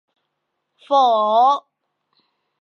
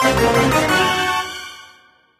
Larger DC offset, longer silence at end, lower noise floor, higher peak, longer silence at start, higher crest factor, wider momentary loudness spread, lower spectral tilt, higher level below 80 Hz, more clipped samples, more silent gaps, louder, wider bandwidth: neither; first, 1 s vs 0.55 s; first, -76 dBFS vs -51 dBFS; about the same, -4 dBFS vs -2 dBFS; first, 0.9 s vs 0 s; about the same, 16 dB vs 16 dB; second, 5 LU vs 15 LU; about the same, -4 dB/octave vs -4 dB/octave; second, -86 dBFS vs -38 dBFS; neither; neither; about the same, -17 LUFS vs -16 LUFS; second, 6.8 kHz vs 15 kHz